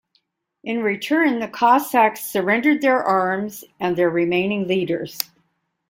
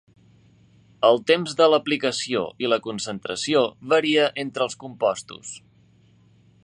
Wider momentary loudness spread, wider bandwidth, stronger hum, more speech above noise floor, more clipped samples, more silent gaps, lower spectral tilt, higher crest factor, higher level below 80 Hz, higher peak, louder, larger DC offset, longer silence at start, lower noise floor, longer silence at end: about the same, 11 LU vs 12 LU; first, 16.5 kHz vs 10.5 kHz; neither; first, 49 dB vs 34 dB; neither; neither; first, -5 dB/octave vs -3.5 dB/octave; about the same, 20 dB vs 20 dB; about the same, -66 dBFS vs -68 dBFS; first, 0 dBFS vs -4 dBFS; about the same, -20 LUFS vs -22 LUFS; neither; second, 0.65 s vs 1 s; first, -69 dBFS vs -56 dBFS; second, 0.65 s vs 1.05 s